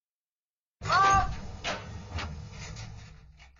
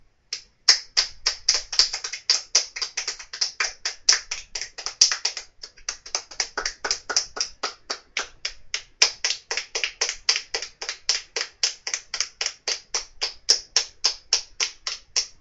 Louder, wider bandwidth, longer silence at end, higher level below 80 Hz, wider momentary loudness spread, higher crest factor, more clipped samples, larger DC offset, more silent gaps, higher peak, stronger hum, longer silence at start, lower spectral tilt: second, -28 LUFS vs -24 LUFS; second, 7.6 kHz vs 12 kHz; about the same, 0.1 s vs 0.1 s; first, -44 dBFS vs -54 dBFS; first, 20 LU vs 13 LU; second, 18 dB vs 26 dB; neither; neither; neither; second, -14 dBFS vs 0 dBFS; neither; first, 0.8 s vs 0.3 s; first, -3.5 dB/octave vs 3 dB/octave